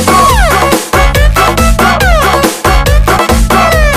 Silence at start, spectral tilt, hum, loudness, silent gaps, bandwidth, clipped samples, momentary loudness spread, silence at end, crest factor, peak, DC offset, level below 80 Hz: 0 s; -4 dB/octave; none; -8 LUFS; none; 16 kHz; 0.5%; 2 LU; 0 s; 6 dB; 0 dBFS; under 0.1%; -12 dBFS